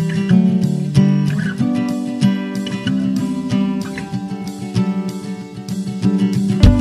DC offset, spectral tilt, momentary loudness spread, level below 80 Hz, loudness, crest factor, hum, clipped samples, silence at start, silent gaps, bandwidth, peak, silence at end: under 0.1%; -7.5 dB/octave; 11 LU; -28 dBFS; -18 LUFS; 16 dB; none; under 0.1%; 0 s; none; 13 kHz; 0 dBFS; 0 s